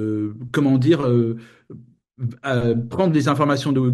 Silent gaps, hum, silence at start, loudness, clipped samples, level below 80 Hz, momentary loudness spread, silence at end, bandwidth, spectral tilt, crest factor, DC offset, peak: none; none; 0 s; -20 LUFS; under 0.1%; -54 dBFS; 11 LU; 0 s; 12.5 kHz; -7.5 dB/octave; 16 dB; under 0.1%; -4 dBFS